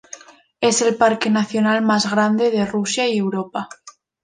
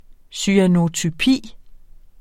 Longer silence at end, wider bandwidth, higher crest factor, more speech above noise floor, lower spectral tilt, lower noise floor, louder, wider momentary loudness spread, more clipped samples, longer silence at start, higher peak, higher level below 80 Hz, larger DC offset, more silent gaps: about the same, 0.35 s vs 0.45 s; second, 10 kHz vs 14 kHz; about the same, 18 dB vs 18 dB; about the same, 24 dB vs 24 dB; about the same, -4 dB/octave vs -5 dB/octave; about the same, -42 dBFS vs -41 dBFS; about the same, -18 LUFS vs -18 LUFS; first, 12 LU vs 8 LU; neither; about the same, 0.15 s vs 0.1 s; about the same, -2 dBFS vs -2 dBFS; second, -62 dBFS vs -44 dBFS; neither; neither